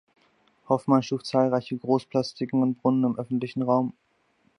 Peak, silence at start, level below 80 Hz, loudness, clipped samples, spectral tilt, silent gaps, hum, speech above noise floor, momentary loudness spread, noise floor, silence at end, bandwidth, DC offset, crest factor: -6 dBFS; 0.7 s; -72 dBFS; -25 LUFS; under 0.1%; -7.5 dB/octave; none; none; 42 dB; 5 LU; -67 dBFS; 0.65 s; 10.5 kHz; under 0.1%; 20 dB